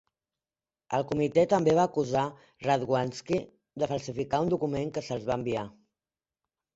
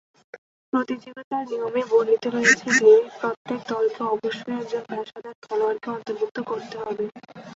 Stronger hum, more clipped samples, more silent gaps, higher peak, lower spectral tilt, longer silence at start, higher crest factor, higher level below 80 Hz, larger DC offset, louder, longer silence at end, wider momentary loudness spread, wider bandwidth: neither; neither; second, none vs 0.38-0.72 s, 1.24-1.31 s, 3.37-3.45 s, 5.35-5.42 s, 6.31-6.35 s; second, -10 dBFS vs -4 dBFS; first, -6.5 dB/octave vs -3.5 dB/octave; first, 0.9 s vs 0.35 s; about the same, 20 dB vs 20 dB; first, -60 dBFS vs -72 dBFS; neither; second, -29 LUFS vs -23 LUFS; first, 1.05 s vs 0 s; second, 10 LU vs 15 LU; about the same, 8 kHz vs 8 kHz